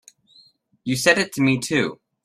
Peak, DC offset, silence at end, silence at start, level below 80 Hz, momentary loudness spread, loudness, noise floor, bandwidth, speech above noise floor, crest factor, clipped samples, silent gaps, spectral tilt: -2 dBFS; under 0.1%; 0.3 s; 0.85 s; -60 dBFS; 10 LU; -20 LUFS; -56 dBFS; 15.5 kHz; 36 dB; 20 dB; under 0.1%; none; -4 dB/octave